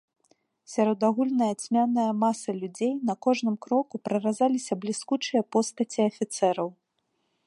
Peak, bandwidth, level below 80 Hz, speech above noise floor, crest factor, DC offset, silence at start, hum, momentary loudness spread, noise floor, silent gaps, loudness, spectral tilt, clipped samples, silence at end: -10 dBFS; 11.5 kHz; -80 dBFS; 50 dB; 16 dB; under 0.1%; 0.7 s; none; 6 LU; -76 dBFS; none; -27 LUFS; -5 dB/octave; under 0.1%; 0.75 s